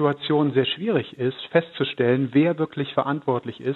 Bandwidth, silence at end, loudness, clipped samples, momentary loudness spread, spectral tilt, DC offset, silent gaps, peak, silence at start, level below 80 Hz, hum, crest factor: 4.3 kHz; 0 s; -23 LUFS; under 0.1%; 6 LU; -9 dB/octave; under 0.1%; none; -2 dBFS; 0 s; -70 dBFS; none; 20 dB